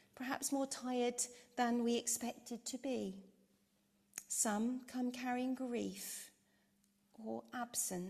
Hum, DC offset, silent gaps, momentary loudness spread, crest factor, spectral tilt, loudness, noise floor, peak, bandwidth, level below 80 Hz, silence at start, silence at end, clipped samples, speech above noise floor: none; under 0.1%; none; 11 LU; 20 dB; -3 dB/octave; -40 LUFS; -77 dBFS; -22 dBFS; 15 kHz; -82 dBFS; 0.15 s; 0 s; under 0.1%; 36 dB